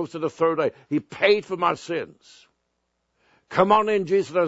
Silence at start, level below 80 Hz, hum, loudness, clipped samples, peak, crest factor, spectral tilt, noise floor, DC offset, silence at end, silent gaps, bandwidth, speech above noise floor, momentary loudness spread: 0 s; -66 dBFS; none; -23 LUFS; under 0.1%; -2 dBFS; 20 dB; -5.5 dB/octave; -75 dBFS; under 0.1%; 0 s; none; 8 kHz; 52 dB; 10 LU